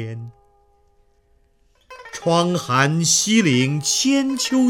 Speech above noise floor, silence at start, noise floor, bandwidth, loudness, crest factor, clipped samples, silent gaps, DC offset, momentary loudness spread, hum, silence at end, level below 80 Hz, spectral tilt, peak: 41 dB; 0 s; -59 dBFS; 17 kHz; -18 LUFS; 16 dB; under 0.1%; none; under 0.1%; 18 LU; none; 0 s; -60 dBFS; -3.5 dB/octave; -4 dBFS